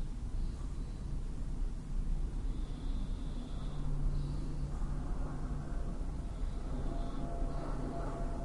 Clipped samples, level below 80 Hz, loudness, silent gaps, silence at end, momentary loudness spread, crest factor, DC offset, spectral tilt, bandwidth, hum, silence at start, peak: under 0.1%; -38 dBFS; -42 LUFS; none; 0 s; 3 LU; 12 dB; under 0.1%; -7.5 dB/octave; 11 kHz; none; 0 s; -24 dBFS